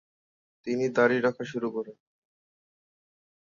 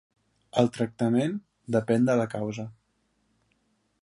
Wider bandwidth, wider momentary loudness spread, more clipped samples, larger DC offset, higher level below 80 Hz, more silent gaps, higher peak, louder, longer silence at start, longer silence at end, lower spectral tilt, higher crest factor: second, 7.4 kHz vs 11.5 kHz; first, 16 LU vs 13 LU; neither; neither; second, -76 dBFS vs -66 dBFS; neither; about the same, -10 dBFS vs -8 dBFS; about the same, -27 LUFS vs -27 LUFS; about the same, 0.65 s vs 0.55 s; first, 1.5 s vs 1.3 s; about the same, -6 dB/octave vs -7 dB/octave; about the same, 20 dB vs 20 dB